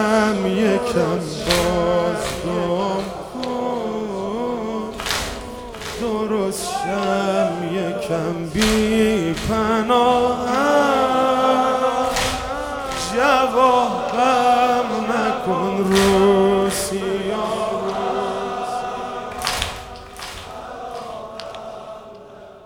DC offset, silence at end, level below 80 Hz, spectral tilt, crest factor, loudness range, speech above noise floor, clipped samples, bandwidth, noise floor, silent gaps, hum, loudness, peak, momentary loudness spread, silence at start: under 0.1%; 0 s; -42 dBFS; -4.5 dB/octave; 20 dB; 8 LU; 22 dB; under 0.1%; 19 kHz; -40 dBFS; none; none; -19 LUFS; 0 dBFS; 16 LU; 0 s